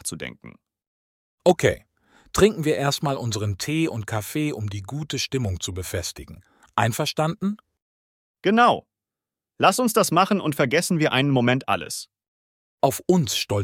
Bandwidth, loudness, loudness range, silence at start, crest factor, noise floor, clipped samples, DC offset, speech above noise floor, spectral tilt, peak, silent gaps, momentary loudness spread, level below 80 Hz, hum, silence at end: 17.5 kHz; -23 LUFS; 6 LU; 0.05 s; 20 dB; -89 dBFS; under 0.1%; under 0.1%; 66 dB; -4.5 dB/octave; -4 dBFS; 0.87-1.38 s, 7.82-8.35 s, 12.28-12.78 s; 12 LU; -52 dBFS; none; 0 s